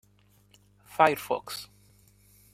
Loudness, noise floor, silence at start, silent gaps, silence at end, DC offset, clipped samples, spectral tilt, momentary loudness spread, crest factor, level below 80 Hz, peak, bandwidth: -27 LUFS; -62 dBFS; 0.95 s; none; 0.9 s; under 0.1%; under 0.1%; -4 dB/octave; 17 LU; 26 dB; -68 dBFS; -6 dBFS; 16 kHz